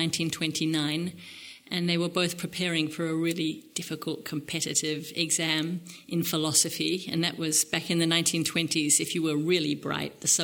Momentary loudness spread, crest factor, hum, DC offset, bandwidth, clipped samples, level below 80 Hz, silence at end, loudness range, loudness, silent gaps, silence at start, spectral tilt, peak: 11 LU; 20 dB; none; under 0.1%; 19 kHz; under 0.1%; -68 dBFS; 0 s; 5 LU; -27 LUFS; none; 0 s; -3 dB/octave; -8 dBFS